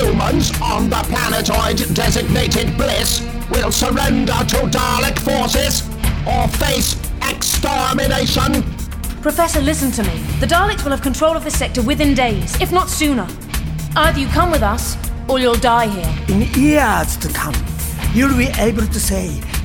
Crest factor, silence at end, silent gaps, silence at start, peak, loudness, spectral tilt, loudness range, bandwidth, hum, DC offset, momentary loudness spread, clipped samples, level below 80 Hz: 14 dB; 0 s; none; 0 s; -2 dBFS; -16 LUFS; -4 dB/octave; 1 LU; over 20 kHz; none; under 0.1%; 6 LU; under 0.1%; -22 dBFS